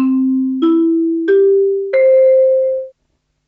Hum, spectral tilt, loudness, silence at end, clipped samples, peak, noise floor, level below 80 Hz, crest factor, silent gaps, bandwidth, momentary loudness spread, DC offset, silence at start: none; -8 dB/octave; -13 LUFS; 0.6 s; under 0.1%; -4 dBFS; -66 dBFS; -68 dBFS; 8 dB; none; 4.3 kHz; 7 LU; under 0.1%; 0 s